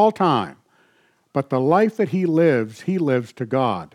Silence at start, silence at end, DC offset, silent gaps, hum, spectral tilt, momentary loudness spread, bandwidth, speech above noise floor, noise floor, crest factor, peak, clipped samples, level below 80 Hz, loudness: 0 s; 0.1 s; under 0.1%; none; none; -8 dB/octave; 8 LU; 12 kHz; 42 dB; -61 dBFS; 14 dB; -6 dBFS; under 0.1%; -72 dBFS; -20 LUFS